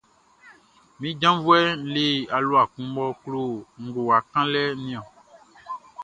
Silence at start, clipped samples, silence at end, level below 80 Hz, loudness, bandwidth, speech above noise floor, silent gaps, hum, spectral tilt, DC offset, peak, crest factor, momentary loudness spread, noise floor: 0.45 s; under 0.1%; 0 s; -64 dBFS; -23 LUFS; 9.6 kHz; 32 dB; none; none; -5.5 dB/octave; under 0.1%; -4 dBFS; 20 dB; 16 LU; -55 dBFS